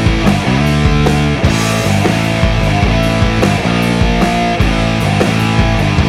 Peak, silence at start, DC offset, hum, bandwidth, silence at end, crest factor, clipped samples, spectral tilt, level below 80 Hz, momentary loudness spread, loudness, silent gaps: 0 dBFS; 0 s; under 0.1%; none; 15.5 kHz; 0 s; 10 dB; under 0.1%; -6 dB/octave; -20 dBFS; 1 LU; -12 LUFS; none